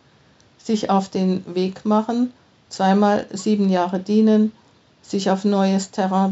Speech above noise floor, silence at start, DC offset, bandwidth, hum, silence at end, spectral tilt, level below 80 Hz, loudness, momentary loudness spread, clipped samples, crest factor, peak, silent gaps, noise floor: 36 dB; 0.65 s; under 0.1%; 8 kHz; none; 0 s; -6.5 dB/octave; -66 dBFS; -20 LUFS; 8 LU; under 0.1%; 16 dB; -4 dBFS; none; -54 dBFS